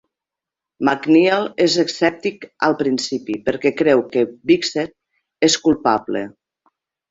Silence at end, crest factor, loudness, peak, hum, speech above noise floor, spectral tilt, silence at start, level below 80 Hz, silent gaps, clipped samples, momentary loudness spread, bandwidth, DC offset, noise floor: 0.8 s; 18 dB; -18 LUFS; -2 dBFS; none; 69 dB; -4 dB/octave; 0.8 s; -58 dBFS; none; under 0.1%; 11 LU; 7.8 kHz; under 0.1%; -86 dBFS